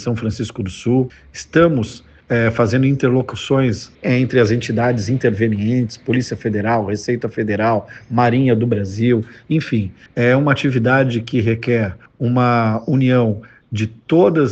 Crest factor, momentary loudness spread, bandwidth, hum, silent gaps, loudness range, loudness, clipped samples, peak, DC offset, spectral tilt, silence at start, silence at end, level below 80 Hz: 16 dB; 9 LU; 8.4 kHz; none; none; 2 LU; -17 LUFS; under 0.1%; 0 dBFS; under 0.1%; -7.5 dB/octave; 0 s; 0 s; -48 dBFS